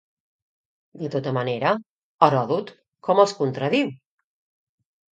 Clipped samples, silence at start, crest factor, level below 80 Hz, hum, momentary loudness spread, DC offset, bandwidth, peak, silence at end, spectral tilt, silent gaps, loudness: under 0.1%; 0.95 s; 24 dB; -72 dBFS; none; 11 LU; under 0.1%; 9.4 kHz; 0 dBFS; 1.2 s; -6 dB/octave; 1.86-2.18 s, 2.88-2.92 s; -22 LUFS